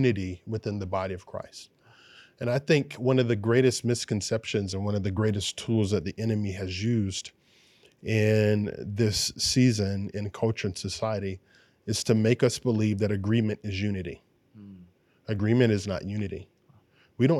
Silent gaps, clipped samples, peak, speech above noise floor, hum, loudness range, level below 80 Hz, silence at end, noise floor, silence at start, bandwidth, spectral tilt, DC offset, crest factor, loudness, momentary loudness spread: none; under 0.1%; -8 dBFS; 35 dB; none; 3 LU; -60 dBFS; 0 s; -61 dBFS; 0 s; 14 kHz; -5.5 dB/octave; under 0.1%; 20 dB; -27 LUFS; 13 LU